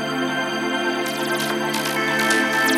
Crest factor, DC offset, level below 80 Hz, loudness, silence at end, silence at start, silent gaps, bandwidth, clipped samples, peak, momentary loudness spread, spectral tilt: 16 dB; under 0.1%; -62 dBFS; -21 LUFS; 0 s; 0 s; none; 16.5 kHz; under 0.1%; -6 dBFS; 5 LU; -3 dB/octave